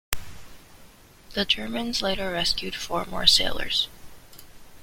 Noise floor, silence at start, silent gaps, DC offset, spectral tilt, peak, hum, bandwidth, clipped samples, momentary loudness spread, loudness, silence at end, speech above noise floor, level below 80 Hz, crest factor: -50 dBFS; 0.1 s; none; under 0.1%; -2 dB/octave; -2 dBFS; none; 16.5 kHz; under 0.1%; 14 LU; -24 LUFS; 0 s; 26 dB; -44 dBFS; 24 dB